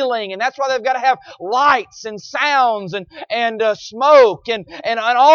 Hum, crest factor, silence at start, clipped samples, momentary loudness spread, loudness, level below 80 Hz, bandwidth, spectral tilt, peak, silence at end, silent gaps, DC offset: none; 16 dB; 0 s; under 0.1%; 13 LU; -16 LUFS; -60 dBFS; 7 kHz; -3 dB/octave; 0 dBFS; 0 s; none; under 0.1%